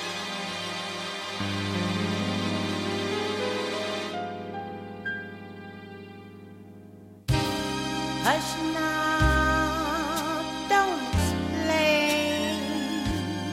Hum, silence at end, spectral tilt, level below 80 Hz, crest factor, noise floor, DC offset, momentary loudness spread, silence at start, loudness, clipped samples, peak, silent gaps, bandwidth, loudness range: none; 0 s; -4.5 dB/octave; -40 dBFS; 20 dB; -48 dBFS; under 0.1%; 19 LU; 0 s; -27 LUFS; under 0.1%; -8 dBFS; none; 16 kHz; 9 LU